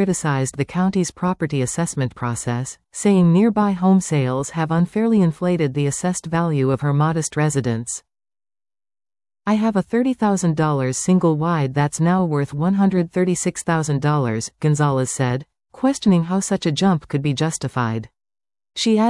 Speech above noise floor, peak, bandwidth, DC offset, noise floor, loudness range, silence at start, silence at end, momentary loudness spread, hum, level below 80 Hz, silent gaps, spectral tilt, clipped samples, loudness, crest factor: over 71 dB; -6 dBFS; 12 kHz; under 0.1%; under -90 dBFS; 4 LU; 0 s; 0 s; 6 LU; none; -52 dBFS; none; -6 dB/octave; under 0.1%; -20 LUFS; 14 dB